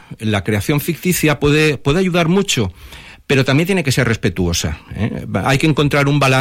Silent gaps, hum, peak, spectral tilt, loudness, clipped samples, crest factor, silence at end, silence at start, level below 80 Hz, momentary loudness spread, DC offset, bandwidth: none; none; -2 dBFS; -5 dB/octave; -16 LUFS; under 0.1%; 12 dB; 0 s; 0.1 s; -36 dBFS; 9 LU; under 0.1%; 16.5 kHz